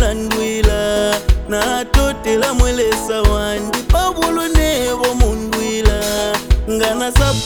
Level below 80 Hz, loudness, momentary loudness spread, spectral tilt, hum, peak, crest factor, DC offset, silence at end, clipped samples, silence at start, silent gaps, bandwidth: -18 dBFS; -16 LUFS; 3 LU; -4.5 dB/octave; none; 0 dBFS; 14 dB; under 0.1%; 0 s; under 0.1%; 0 s; none; over 20 kHz